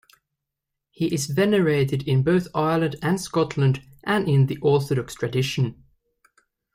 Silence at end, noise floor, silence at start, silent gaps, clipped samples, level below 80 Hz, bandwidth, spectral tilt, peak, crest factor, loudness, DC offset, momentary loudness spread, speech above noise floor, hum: 1 s; -83 dBFS; 1 s; none; under 0.1%; -56 dBFS; 15.5 kHz; -6.5 dB/octave; -8 dBFS; 14 dB; -23 LUFS; under 0.1%; 7 LU; 62 dB; none